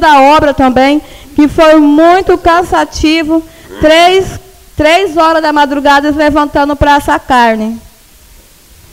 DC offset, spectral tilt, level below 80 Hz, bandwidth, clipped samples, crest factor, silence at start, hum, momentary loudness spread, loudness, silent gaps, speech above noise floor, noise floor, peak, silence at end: under 0.1%; -4.5 dB/octave; -28 dBFS; 16 kHz; 0.5%; 8 dB; 0 s; none; 9 LU; -7 LUFS; none; 32 dB; -39 dBFS; 0 dBFS; 1.1 s